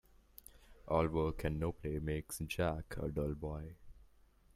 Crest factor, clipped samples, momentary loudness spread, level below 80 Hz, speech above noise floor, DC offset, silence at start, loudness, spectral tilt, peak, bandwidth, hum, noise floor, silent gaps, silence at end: 20 dB; under 0.1%; 20 LU; -50 dBFS; 28 dB; under 0.1%; 0.6 s; -39 LUFS; -6.5 dB/octave; -18 dBFS; 16 kHz; none; -66 dBFS; none; 0.55 s